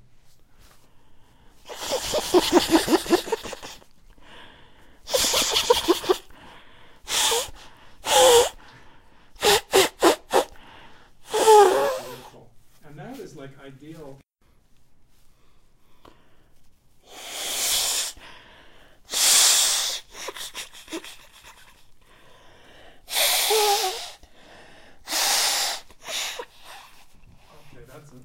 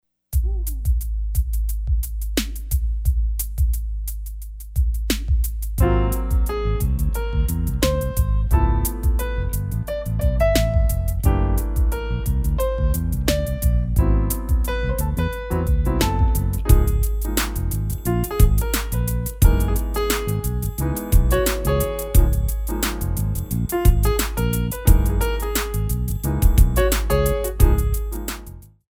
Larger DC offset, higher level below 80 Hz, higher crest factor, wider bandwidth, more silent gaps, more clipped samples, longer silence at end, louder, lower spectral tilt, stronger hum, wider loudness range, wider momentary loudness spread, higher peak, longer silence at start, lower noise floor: neither; second, -52 dBFS vs -20 dBFS; first, 24 dB vs 18 dB; second, 16 kHz vs 19 kHz; neither; neither; second, 0 s vs 0.3 s; about the same, -20 LUFS vs -22 LUFS; second, -1 dB/octave vs -5.5 dB/octave; neither; first, 8 LU vs 4 LU; first, 25 LU vs 7 LU; about the same, -2 dBFS vs -2 dBFS; first, 1.1 s vs 0.3 s; first, -59 dBFS vs -39 dBFS